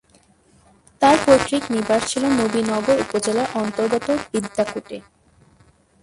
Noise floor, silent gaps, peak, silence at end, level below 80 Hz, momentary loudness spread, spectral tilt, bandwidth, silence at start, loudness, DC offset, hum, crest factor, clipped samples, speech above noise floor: -56 dBFS; none; 0 dBFS; 1.05 s; -52 dBFS; 9 LU; -4 dB/octave; 11.5 kHz; 1 s; -19 LUFS; under 0.1%; none; 20 dB; under 0.1%; 37 dB